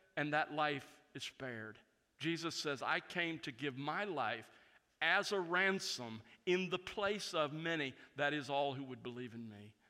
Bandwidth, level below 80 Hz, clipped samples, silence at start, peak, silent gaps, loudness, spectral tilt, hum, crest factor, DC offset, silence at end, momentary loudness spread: 15.5 kHz; -80 dBFS; under 0.1%; 0.15 s; -20 dBFS; none; -39 LUFS; -4 dB/octave; none; 22 dB; under 0.1%; 0.2 s; 13 LU